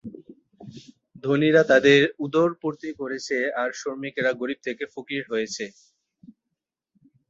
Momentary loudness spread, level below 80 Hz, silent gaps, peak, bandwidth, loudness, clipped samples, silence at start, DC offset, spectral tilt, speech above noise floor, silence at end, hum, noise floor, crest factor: 17 LU; -66 dBFS; none; -4 dBFS; 7.8 kHz; -23 LUFS; under 0.1%; 0.05 s; under 0.1%; -5 dB/octave; 60 dB; 1.6 s; none; -83 dBFS; 22 dB